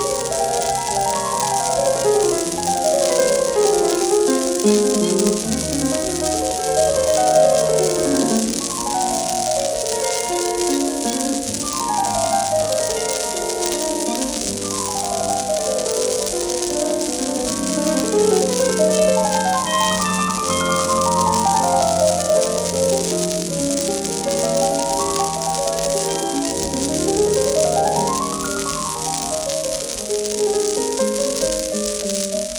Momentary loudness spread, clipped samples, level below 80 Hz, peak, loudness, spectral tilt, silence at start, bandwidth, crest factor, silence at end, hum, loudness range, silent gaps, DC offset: 5 LU; under 0.1%; -44 dBFS; -2 dBFS; -19 LUFS; -3 dB/octave; 0 s; over 20 kHz; 16 dB; 0 s; none; 3 LU; none; under 0.1%